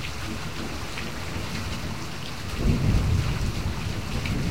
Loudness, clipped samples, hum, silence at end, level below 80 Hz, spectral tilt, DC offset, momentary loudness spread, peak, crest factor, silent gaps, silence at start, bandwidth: -29 LUFS; under 0.1%; none; 0 s; -32 dBFS; -5.5 dB/octave; 2%; 9 LU; -8 dBFS; 18 dB; none; 0 s; 16 kHz